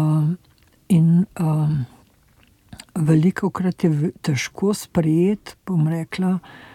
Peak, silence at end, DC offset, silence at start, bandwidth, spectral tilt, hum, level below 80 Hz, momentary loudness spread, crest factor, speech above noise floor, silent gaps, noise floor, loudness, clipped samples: -4 dBFS; 0.2 s; under 0.1%; 0 s; 14.5 kHz; -7.5 dB/octave; none; -54 dBFS; 9 LU; 16 dB; 36 dB; none; -56 dBFS; -21 LUFS; under 0.1%